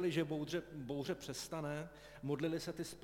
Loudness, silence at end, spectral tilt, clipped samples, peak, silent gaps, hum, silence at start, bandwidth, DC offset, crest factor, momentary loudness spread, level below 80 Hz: -42 LUFS; 0 s; -5.5 dB/octave; under 0.1%; -24 dBFS; none; none; 0 s; 16.5 kHz; under 0.1%; 18 dB; 7 LU; -68 dBFS